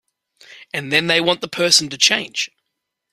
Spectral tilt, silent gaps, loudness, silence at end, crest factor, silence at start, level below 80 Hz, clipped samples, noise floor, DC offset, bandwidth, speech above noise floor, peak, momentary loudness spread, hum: -1.5 dB/octave; none; -16 LUFS; 0.65 s; 20 dB; 0.5 s; -62 dBFS; under 0.1%; -78 dBFS; under 0.1%; 15.5 kHz; 60 dB; 0 dBFS; 14 LU; none